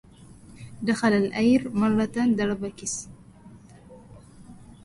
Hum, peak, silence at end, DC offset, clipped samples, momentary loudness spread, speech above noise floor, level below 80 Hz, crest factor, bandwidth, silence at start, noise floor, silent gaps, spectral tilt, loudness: none; -10 dBFS; 0.1 s; under 0.1%; under 0.1%; 15 LU; 25 dB; -54 dBFS; 18 dB; 11.5 kHz; 0.3 s; -49 dBFS; none; -5 dB/octave; -24 LUFS